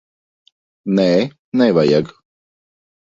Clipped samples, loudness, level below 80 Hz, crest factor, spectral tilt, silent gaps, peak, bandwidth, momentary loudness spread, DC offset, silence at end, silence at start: under 0.1%; -16 LUFS; -58 dBFS; 18 dB; -7 dB/octave; 1.39-1.52 s; -2 dBFS; 7.6 kHz; 13 LU; under 0.1%; 1.1 s; 0.85 s